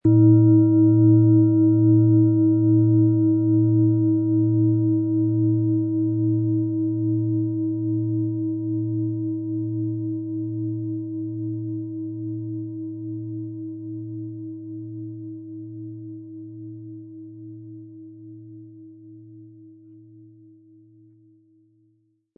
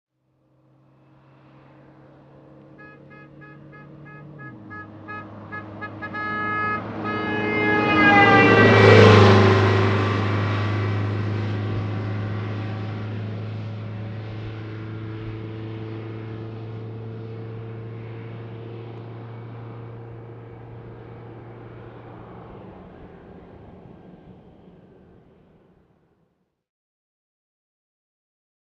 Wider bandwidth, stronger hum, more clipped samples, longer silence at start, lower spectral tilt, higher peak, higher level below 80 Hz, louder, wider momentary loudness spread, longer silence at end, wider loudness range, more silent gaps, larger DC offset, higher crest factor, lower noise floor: second, 1.4 kHz vs 7.8 kHz; neither; neither; second, 0.05 s vs 2.8 s; first, -17.5 dB/octave vs -7 dB/octave; second, -6 dBFS vs 0 dBFS; second, -64 dBFS vs -52 dBFS; about the same, -21 LUFS vs -19 LUFS; second, 22 LU vs 28 LU; second, 2.7 s vs 4.35 s; second, 22 LU vs 26 LU; neither; neither; second, 16 dB vs 24 dB; about the same, -66 dBFS vs -69 dBFS